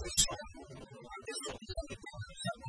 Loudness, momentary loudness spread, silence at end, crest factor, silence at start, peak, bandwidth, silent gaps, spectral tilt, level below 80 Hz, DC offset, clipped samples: -38 LUFS; 20 LU; 0 s; 26 dB; 0 s; -14 dBFS; 11 kHz; none; -1.5 dB/octave; -52 dBFS; under 0.1%; under 0.1%